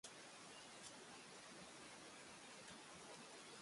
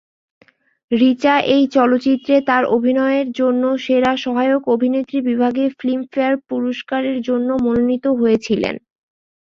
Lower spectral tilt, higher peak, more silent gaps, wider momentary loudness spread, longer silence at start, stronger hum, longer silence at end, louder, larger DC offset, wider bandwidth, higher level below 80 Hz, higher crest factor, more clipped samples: second, -2 dB/octave vs -6 dB/octave; second, -40 dBFS vs -2 dBFS; neither; second, 1 LU vs 6 LU; second, 0.05 s vs 0.9 s; neither; second, 0 s vs 0.75 s; second, -58 LUFS vs -17 LUFS; neither; first, 11.5 kHz vs 7.2 kHz; second, -88 dBFS vs -56 dBFS; about the same, 18 dB vs 16 dB; neither